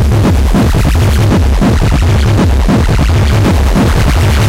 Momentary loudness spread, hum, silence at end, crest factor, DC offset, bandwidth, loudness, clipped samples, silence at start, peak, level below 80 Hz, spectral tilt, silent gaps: 1 LU; none; 0 s; 6 dB; under 0.1%; 16 kHz; -10 LUFS; under 0.1%; 0 s; -2 dBFS; -12 dBFS; -6.5 dB/octave; none